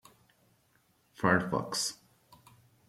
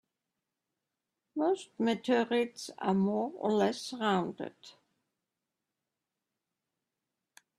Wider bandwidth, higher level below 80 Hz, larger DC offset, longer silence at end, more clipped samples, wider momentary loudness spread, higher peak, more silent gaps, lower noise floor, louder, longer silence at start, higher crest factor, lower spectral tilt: first, 15.5 kHz vs 13 kHz; first, -68 dBFS vs -78 dBFS; neither; second, 0.95 s vs 2.9 s; neither; about the same, 8 LU vs 10 LU; first, -10 dBFS vs -16 dBFS; neither; second, -70 dBFS vs -89 dBFS; about the same, -31 LUFS vs -32 LUFS; second, 1.2 s vs 1.35 s; first, 26 dB vs 20 dB; second, -4 dB/octave vs -5.5 dB/octave